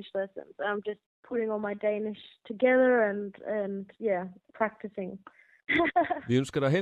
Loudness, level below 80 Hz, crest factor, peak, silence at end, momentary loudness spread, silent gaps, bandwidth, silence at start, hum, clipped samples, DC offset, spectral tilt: -29 LUFS; -66 dBFS; 18 dB; -12 dBFS; 0 s; 16 LU; 1.06-1.23 s; 10.5 kHz; 0 s; none; under 0.1%; under 0.1%; -6.5 dB/octave